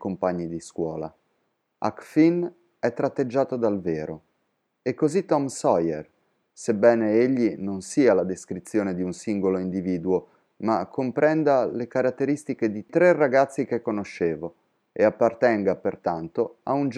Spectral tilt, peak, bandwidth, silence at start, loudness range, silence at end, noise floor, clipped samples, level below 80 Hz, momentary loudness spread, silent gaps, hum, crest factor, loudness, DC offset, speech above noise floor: -6.5 dB/octave; -4 dBFS; 11.5 kHz; 0 s; 4 LU; 0 s; -74 dBFS; under 0.1%; -66 dBFS; 11 LU; none; none; 20 dB; -24 LUFS; under 0.1%; 51 dB